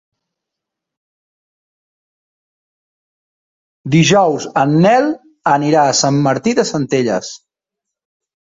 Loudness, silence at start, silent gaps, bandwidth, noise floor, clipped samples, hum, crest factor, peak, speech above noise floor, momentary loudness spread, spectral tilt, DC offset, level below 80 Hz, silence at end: -14 LUFS; 3.85 s; none; 8 kHz; -81 dBFS; under 0.1%; none; 16 dB; 0 dBFS; 69 dB; 9 LU; -5 dB/octave; under 0.1%; -56 dBFS; 1.2 s